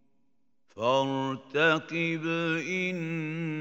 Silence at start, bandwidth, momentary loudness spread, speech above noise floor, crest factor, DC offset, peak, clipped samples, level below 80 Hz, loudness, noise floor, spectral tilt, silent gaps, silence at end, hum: 0.75 s; 8 kHz; 8 LU; 48 dB; 20 dB; under 0.1%; -10 dBFS; under 0.1%; -78 dBFS; -29 LUFS; -77 dBFS; -5.5 dB/octave; none; 0 s; none